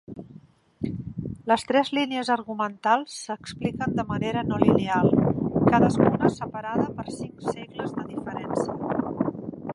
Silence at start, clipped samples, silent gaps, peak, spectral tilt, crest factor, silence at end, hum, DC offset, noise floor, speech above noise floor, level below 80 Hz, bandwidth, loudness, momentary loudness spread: 0.1 s; under 0.1%; none; -2 dBFS; -6.5 dB/octave; 24 dB; 0 s; none; under 0.1%; -51 dBFS; 27 dB; -52 dBFS; 11.5 kHz; -25 LUFS; 13 LU